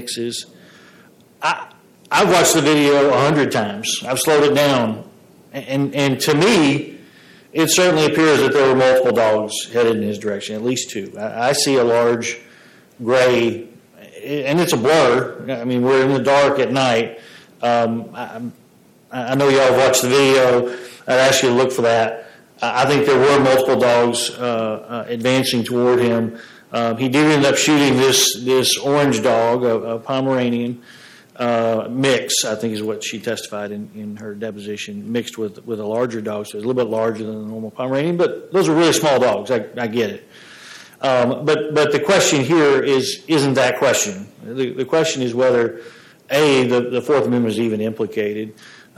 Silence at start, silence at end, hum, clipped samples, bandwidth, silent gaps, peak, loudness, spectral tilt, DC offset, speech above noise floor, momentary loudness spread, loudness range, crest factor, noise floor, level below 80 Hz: 0 s; 0.45 s; none; under 0.1%; 16 kHz; none; -4 dBFS; -17 LUFS; -4 dB/octave; under 0.1%; 34 dB; 14 LU; 6 LU; 14 dB; -51 dBFS; -58 dBFS